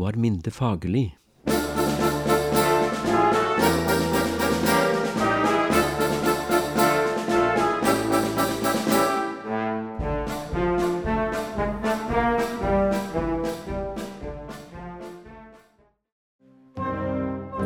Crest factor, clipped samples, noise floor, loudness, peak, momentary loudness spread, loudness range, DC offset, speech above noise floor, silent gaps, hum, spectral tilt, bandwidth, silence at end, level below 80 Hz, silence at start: 18 dB; under 0.1%; -62 dBFS; -23 LUFS; -6 dBFS; 12 LU; 12 LU; under 0.1%; 37 dB; 16.12-16.39 s; none; -5 dB/octave; over 20 kHz; 0 s; -42 dBFS; 0 s